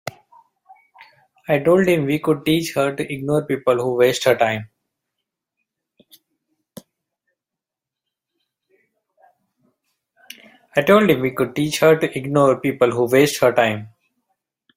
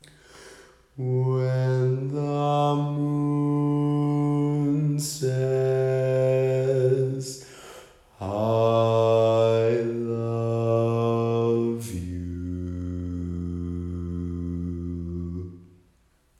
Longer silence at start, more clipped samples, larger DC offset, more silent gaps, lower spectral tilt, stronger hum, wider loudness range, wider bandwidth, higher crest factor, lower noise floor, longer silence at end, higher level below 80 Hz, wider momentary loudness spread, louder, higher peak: second, 0.05 s vs 0.35 s; neither; neither; neither; second, -5.5 dB/octave vs -7.5 dB/octave; neither; second, 6 LU vs 9 LU; first, 16 kHz vs 13.5 kHz; first, 20 dB vs 14 dB; first, -86 dBFS vs -63 dBFS; first, 0.9 s vs 0.75 s; second, -60 dBFS vs -50 dBFS; second, 7 LU vs 12 LU; first, -18 LUFS vs -25 LUFS; first, -2 dBFS vs -10 dBFS